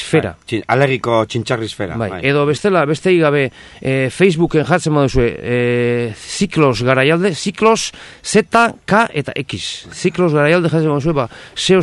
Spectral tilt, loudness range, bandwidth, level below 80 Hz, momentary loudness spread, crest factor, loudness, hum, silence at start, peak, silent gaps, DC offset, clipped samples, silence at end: -5.5 dB/octave; 1 LU; 12 kHz; -38 dBFS; 9 LU; 16 dB; -15 LUFS; none; 0 s; 0 dBFS; none; under 0.1%; under 0.1%; 0 s